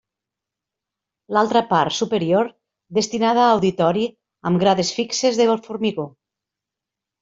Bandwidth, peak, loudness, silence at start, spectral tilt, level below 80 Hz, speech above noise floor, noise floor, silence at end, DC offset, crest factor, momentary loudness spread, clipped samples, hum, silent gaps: 7.8 kHz; -4 dBFS; -19 LUFS; 1.3 s; -5 dB/octave; -62 dBFS; 67 dB; -86 dBFS; 1.15 s; under 0.1%; 18 dB; 9 LU; under 0.1%; none; none